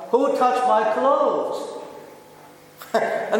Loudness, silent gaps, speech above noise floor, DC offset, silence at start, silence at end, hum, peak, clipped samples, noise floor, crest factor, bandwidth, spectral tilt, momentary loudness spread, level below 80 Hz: -21 LUFS; none; 27 dB; under 0.1%; 0 s; 0 s; none; -6 dBFS; under 0.1%; -46 dBFS; 16 dB; 17.5 kHz; -4.5 dB/octave; 20 LU; -72 dBFS